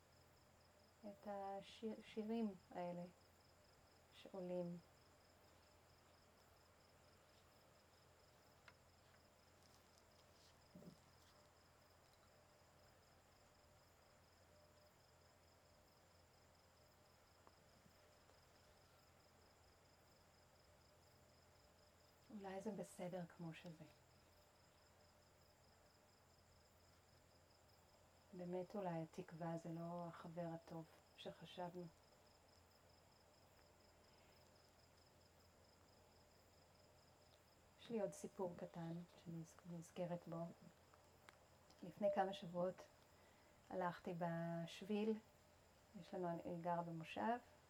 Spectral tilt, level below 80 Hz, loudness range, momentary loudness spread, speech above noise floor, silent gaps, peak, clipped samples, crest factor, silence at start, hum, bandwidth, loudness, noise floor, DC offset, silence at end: -6.5 dB/octave; -84 dBFS; 20 LU; 19 LU; 24 dB; none; -30 dBFS; under 0.1%; 24 dB; 0 s; none; 19.5 kHz; -50 LUFS; -73 dBFS; under 0.1%; 0 s